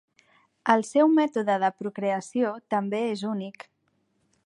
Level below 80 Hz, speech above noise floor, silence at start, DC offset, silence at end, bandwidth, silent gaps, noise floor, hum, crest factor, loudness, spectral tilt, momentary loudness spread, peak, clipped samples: -80 dBFS; 47 dB; 0.65 s; under 0.1%; 0.95 s; 11 kHz; none; -72 dBFS; none; 22 dB; -25 LUFS; -5.5 dB/octave; 11 LU; -4 dBFS; under 0.1%